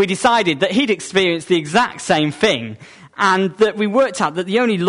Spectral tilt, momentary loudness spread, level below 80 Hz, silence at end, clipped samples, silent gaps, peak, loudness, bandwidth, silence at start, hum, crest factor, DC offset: -4.5 dB/octave; 4 LU; -56 dBFS; 0 s; under 0.1%; none; -2 dBFS; -17 LUFS; 11 kHz; 0 s; none; 14 dB; under 0.1%